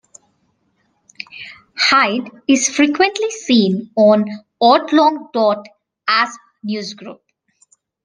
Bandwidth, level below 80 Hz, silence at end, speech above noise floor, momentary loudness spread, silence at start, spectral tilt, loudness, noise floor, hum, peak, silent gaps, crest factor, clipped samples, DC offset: 10 kHz; -66 dBFS; 0.9 s; 49 dB; 19 LU; 1.35 s; -3.5 dB/octave; -15 LUFS; -64 dBFS; none; 0 dBFS; none; 18 dB; under 0.1%; under 0.1%